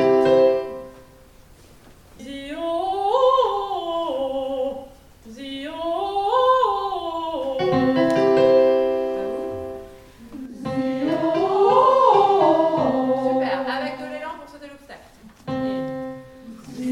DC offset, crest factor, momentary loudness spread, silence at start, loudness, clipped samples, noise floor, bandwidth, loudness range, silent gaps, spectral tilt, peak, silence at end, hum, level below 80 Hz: under 0.1%; 18 dB; 22 LU; 0 s; -20 LUFS; under 0.1%; -48 dBFS; 11.5 kHz; 7 LU; none; -6.5 dB/octave; -4 dBFS; 0 s; none; -54 dBFS